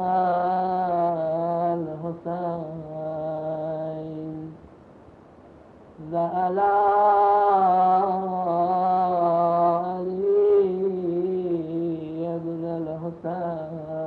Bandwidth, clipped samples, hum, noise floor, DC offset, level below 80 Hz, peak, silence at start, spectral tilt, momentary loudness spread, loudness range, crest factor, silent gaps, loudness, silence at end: 4.8 kHz; under 0.1%; none; -49 dBFS; under 0.1%; -64 dBFS; -10 dBFS; 0 s; -10 dB/octave; 13 LU; 12 LU; 14 dB; none; -24 LUFS; 0 s